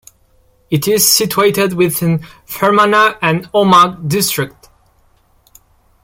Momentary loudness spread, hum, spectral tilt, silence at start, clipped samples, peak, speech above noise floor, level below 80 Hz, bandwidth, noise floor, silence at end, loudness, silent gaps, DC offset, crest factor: 10 LU; none; -3.5 dB/octave; 0.7 s; under 0.1%; 0 dBFS; 40 dB; -50 dBFS; 17 kHz; -53 dBFS; 1.55 s; -12 LUFS; none; under 0.1%; 14 dB